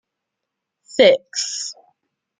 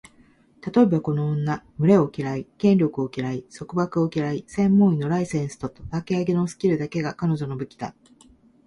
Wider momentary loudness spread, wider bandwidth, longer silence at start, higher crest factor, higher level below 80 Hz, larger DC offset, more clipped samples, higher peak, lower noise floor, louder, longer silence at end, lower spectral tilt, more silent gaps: about the same, 14 LU vs 13 LU; second, 9.6 kHz vs 11 kHz; first, 0.95 s vs 0.65 s; about the same, 20 dB vs 18 dB; second, -68 dBFS vs -54 dBFS; neither; neither; first, -2 dBFS vs -6 dBFS; first, -81 dBFS vs -56 dBFS; first, -18 LUFS vs -23 LUFS; about the same, 0.7 s vs 0.75 s; second, -2 dB/octave vs -8 dB/octave; neither